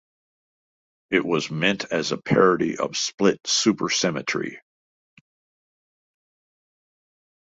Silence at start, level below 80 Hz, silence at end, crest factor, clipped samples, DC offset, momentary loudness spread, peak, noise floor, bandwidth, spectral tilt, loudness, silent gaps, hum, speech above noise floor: 1.1 s; -64 dBFS; 2.95 s; 22 dB; under 0.1%; under 0.1%; 7 LU; -4 dBFS; under -90 dBFS; 8 kHz; -3.5 dB/octave; -22 LUFS; 3.14-3.18 s; none; over 68 dB